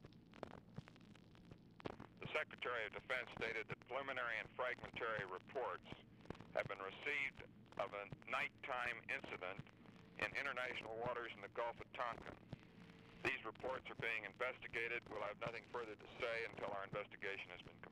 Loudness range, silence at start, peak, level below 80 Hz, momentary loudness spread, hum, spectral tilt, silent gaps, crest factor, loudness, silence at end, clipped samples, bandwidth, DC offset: 2 LU; 0 s; -30 dBFS; -74 dBFS; 15 LU; none; -5 dB/octave; none; 18 dB; -46 LUFS; 0 s; under 0.1%; 15 kHz; under 0.1%